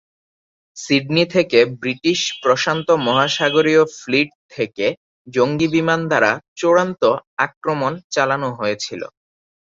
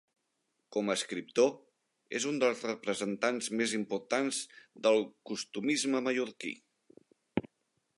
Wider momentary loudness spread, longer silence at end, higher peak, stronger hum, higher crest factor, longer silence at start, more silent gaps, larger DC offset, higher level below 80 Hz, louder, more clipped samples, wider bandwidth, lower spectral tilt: about the same, 9 LU vs 10 LU; first, 0.65 s vs 0.5 s; first, -2 dBFS vs -14 dBFS; neither; about the same, 18 dB vs 20 dB; about the same, 0.75 s vs 0.7 s; first, 4.35-4.49 s, 4.97-5.25 s, 6.48-6.56 s, 7.27-7.37 s, 7.56-7.61 s, 8.04-8.10 s vs none; neither; first, -60 dBFS vs -74 dBFS; first, -18 LUFS vs -33 LUFS; neither; second, 7.8 kHz vs 11.5 kHz; about the same, -4.5 dB/octave vs -3.5 dB/octave